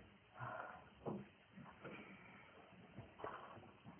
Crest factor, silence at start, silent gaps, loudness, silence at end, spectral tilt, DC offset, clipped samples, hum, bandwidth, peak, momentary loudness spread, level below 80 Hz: 22 dB; 0 s; none; -55 LUFS; 0 s; -3 dB/octave; under 0.1%; under 0.1%; none; 3.2 kHz; -34 dBFS; 11 LU; -78 dBFS